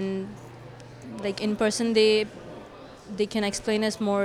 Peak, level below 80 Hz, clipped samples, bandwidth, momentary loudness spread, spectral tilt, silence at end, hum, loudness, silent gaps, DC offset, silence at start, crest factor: -10 dBFS; -58 dBFS; under 0.1%; 13.5 kHz; 23 LU; -4 dB/octave; 0 s; none; -25 LUFS; none; under 0.1%; 0 s; 18 dB